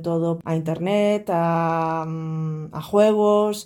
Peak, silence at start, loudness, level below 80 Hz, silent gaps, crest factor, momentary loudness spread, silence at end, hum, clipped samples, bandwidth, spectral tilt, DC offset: -6 dBFS; 0 s; -22 LUFS; -62 dBFS; none; 14 dB; 10 LU; 0 s; none; under 0.1%; 17.5 kHz; -7 dB/octave; under 0.1%